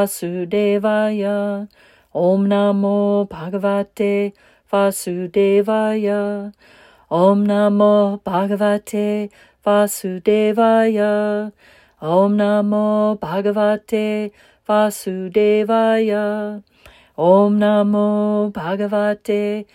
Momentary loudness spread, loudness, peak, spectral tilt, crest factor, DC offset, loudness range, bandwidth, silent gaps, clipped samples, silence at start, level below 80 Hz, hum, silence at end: 10 LU; -17 LUFS; -2 dBFS; -6.5 dB/octave; 16 dB; under 0.1%; 2 LU; 15 kHz; none; under 0.1%; 0 s; -60 dBFS; none; 0.1 s